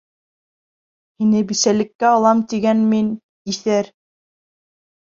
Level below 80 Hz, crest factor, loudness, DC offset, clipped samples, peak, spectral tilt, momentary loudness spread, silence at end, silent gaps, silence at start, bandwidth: -62 dBFS; 16 dB; -17 LUFS; under 0.1%; under 0.1%; -2 dBFS; -4.5 dB/octave; 9 LU; 1.2 s; 1.95-1.99 s, 3.23-3.45 s; 1.2 s; 7.6 kHz